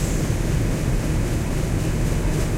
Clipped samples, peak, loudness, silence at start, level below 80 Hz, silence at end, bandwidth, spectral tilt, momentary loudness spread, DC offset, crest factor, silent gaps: under 0.1%; -8 dBFS; -23 LUFS; 0 s; -26 dBFS; 0 s; 16 kHz; -6 dB/octave; 1 LU; under 0.1%; 12 dB; none